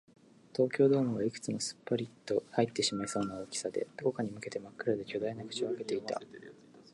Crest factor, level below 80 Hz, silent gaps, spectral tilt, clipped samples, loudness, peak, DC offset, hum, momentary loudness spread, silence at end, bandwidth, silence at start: 20 dB; -72 dBFS; none; -4.5 dB/octave; under 0.1%; -34 LUFS; -14 dBFS; under 0.1%; none; 13 LU; 0.1 s; 11.5 kHz; 0.55 s